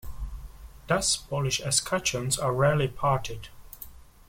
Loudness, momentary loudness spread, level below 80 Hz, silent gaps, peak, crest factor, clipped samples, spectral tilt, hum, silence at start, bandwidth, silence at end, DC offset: -26 LUFS; 20 LU; -44 dBFS; none; -10 dBFS; 18 dB; under 0.1%; -3.5 dB/octave; none; 0.05 s; 16.5 kHz; 0.25 s; under 0.1%